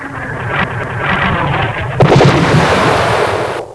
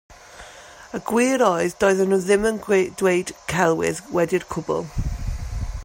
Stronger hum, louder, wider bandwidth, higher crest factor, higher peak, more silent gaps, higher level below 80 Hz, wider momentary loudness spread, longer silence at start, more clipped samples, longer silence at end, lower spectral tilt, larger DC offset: neither; first, -12 LUFS vs -21 LUFS; second, 11 kHz vs 16.5 kHz; about the same, 12 dB vs 16 dB; first, 0 dBFS vs -6 dBFS; neither; about the same, -32 dBFS vs -36 dBFS; second, 9 LU vs 15 LU; about the same, 0 s vs 0.1 s; first, 0.3% vs under 0.1%; about the same, 0 s vs 0 s; about the same, -6 dB/octave vs -5 dB/octave; neither